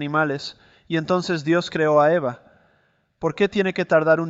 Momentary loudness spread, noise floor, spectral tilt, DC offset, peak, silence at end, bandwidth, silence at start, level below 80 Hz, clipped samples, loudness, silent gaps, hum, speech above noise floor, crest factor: 12 LU; -64 dBFS; -6.5 dB/octave; under 0.1%; -4 dBFS; 0 s; 8 kHz; 0 s; -60 dBFS; under 0.1%; -21 LUFS; none; none; 44 dB; 16 dB